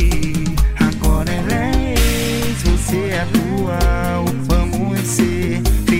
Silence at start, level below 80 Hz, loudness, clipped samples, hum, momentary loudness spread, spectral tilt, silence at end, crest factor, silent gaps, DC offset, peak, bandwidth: 0 s; -20 dBFS; -18 LUFS; under 0.1%; none; 3 LU; -5.5 dB/octave; 0 s; 12 dB; none; under 0.1%; -2 dBFS; 16.5 kHz